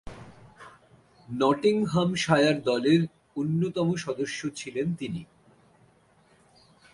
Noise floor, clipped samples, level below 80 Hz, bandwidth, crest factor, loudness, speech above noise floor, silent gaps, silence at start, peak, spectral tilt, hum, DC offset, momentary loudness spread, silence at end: -61 dBFS; under 0.1%; -60 dBFS; 11.5 kHz; 20 dB; -26 LUFS; 36 dB; none; 0.05 s; -8 dBFS; -6 dB/octave; none; under 0.1%; 13 LU; 1.7 s